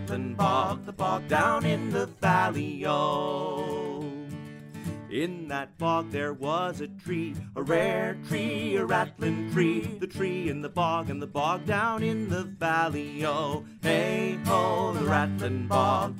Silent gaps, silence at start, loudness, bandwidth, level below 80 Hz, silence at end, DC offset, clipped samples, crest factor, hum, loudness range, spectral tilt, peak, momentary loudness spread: none; 0 s; -28 LUFS; 16 kHz; -60 dBFS; 0 s; under 0.1%; under 0.1%; 18 dB; none; 5 LU; -6 dB/octave; -10 dBFS; 9 LU